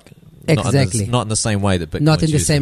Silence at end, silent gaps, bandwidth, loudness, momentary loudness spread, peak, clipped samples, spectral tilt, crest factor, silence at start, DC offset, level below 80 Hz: 0 s; none; 13.5 kHz; -17 LUFS; 4 LU; -2 dBFS; under 0.1%; -5 dB/octave; 14 dB; 0.45 s; under 0.1%; -38 dBFS